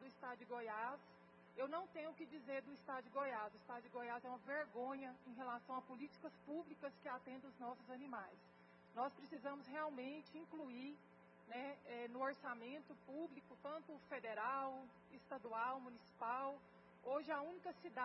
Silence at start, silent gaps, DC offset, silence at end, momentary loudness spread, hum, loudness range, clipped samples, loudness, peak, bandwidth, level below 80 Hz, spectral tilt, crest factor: 0 s; none; under 0.1%; 0 s; 11 LU; none; 4 LU; under 0.1%; -50 LUFS; -32 dBFS; 5.6 kHz; under -90 dBFS; -3 dB/octave; 18 dB